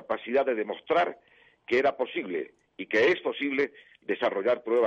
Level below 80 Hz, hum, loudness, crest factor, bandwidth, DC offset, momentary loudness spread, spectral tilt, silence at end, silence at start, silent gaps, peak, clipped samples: -70 dBFS; none; -28 LUFS; 14 dB; 7.6 kHz; under 0.1%; 11 LU; -5 dB/octave; 0 s; 0 s; none; -14 dBFS; under 0.1%